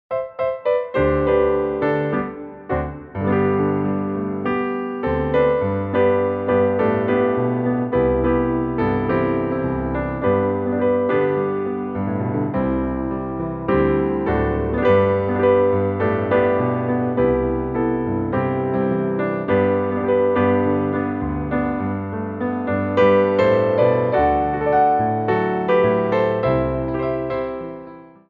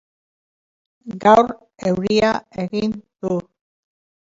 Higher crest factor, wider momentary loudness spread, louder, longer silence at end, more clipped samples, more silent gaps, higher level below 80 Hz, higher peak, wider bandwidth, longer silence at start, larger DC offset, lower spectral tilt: about the same, 16 dB vs 20 dB; second, 8 LU vs 13 LU; about the same, -20 LUFS vs -19 LUFS; second, 0.2 s vs 0.9 s; neither; neither; first, -38 dBFS vs -54 dBFS; second, -4 dBFS vs 0 dBFS; second, 4.9 kHz vs 7.8 kHz; second, 0.1 s vs 1.05 s; neither; first, -10 dB/octave vs -6 dB/octave